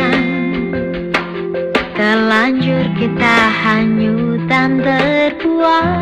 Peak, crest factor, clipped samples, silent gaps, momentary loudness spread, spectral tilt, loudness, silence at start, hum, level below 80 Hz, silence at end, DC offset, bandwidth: 0 dBFS; 14 dB; under 0.1%; none; 7 LU; -6.5 dB/octave; -14 LUFS; 0 s; none; -42 dBFS; 0 s; under 0.1%; 10.5 kHz